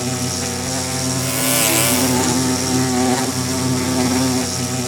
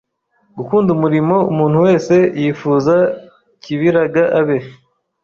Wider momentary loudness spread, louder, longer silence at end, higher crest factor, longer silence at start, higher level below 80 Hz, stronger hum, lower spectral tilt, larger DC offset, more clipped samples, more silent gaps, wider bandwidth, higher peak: about the same, 7 LU vs 6 LU; second, -17 LUFS vs -14 LUFS; second, 0 s vs 0.5 s; about the same, 18 dB vs 14 dB; second, 0 s vs 0.55 s; about the same, -52 dBFS vs -54 dBFS; neither; second, -3.5 dB/octave vs -8 dB/octave; neither; neither; neither; first, over 20 kHz vs 7.4 kHz; about the same, 0 dBFS vs -2 dBFS